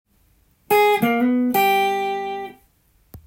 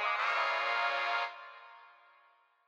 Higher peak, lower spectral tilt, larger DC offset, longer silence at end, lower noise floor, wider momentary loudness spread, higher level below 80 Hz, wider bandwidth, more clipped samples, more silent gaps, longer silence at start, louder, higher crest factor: first, -6 dBFS vs -20 dBFS; first, -4.5 dB/octave vs 2.5 dB/octave; neither; second, 0.1 s vs 0.8 s; second, -60 dBFS vs -67 dBFS; second, 13 LU vs 19 LU; first, -58 dBFS vs under -90 dBFS; about the same, 16.5 kHz vs 17 kHz; neither; neither; first, 0.7 s vs 0 s; first, -19 LUFS vs -32 LUFS; about the same, 16 dB vs 16 dB